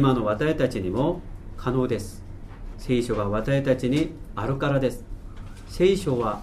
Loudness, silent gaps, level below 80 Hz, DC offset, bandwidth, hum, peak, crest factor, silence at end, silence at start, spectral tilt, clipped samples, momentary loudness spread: -25 LUFS; none; -38 dBFS; under 0.1%; 14 kHz; none; -8 dBFS; 16 dB; 0 s; 0 s; -7 dB/octave; under 0.1%; 20 LU